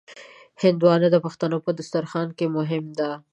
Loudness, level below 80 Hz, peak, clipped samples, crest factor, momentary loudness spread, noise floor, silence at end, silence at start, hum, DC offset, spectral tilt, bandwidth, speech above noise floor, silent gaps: -23 LUFS; -70 dBFS; -4 dBFS; under 0.1%; 18 dB; 10 LU; -46 dBFS; 0.15 s; 0.1 s; none; under 0.1%; -7.5 dB/octave; 8.8 kHz; 24 dB; none